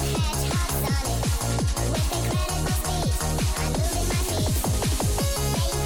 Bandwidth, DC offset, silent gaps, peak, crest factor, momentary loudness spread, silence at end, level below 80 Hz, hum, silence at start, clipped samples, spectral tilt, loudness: 17.5 kHz; under 0.1%; none; -14 dBFS; 10 dB; 1 LU; 0 s; -28 dBFS; none; 0 s; under 0.1%; -4.5 dB/octave; -25 LUFS